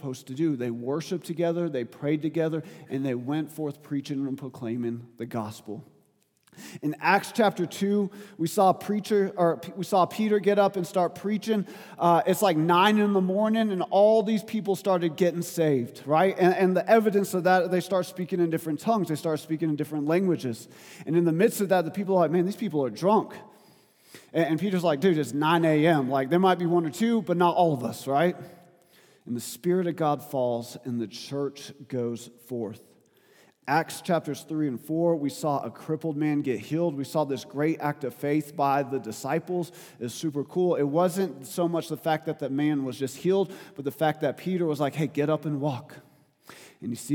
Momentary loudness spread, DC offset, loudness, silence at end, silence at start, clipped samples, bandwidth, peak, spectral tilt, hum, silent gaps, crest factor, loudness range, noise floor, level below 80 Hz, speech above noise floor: 12 LU; under 0.1%; -26 LUFS; 0 s; 0.05 s; under 0.1%; 19 kHz; -6 dBFS; -6 dB/octave; none; none; 20 dB; 7 LU; -67 dBFS; -82 dBFS; 41 dB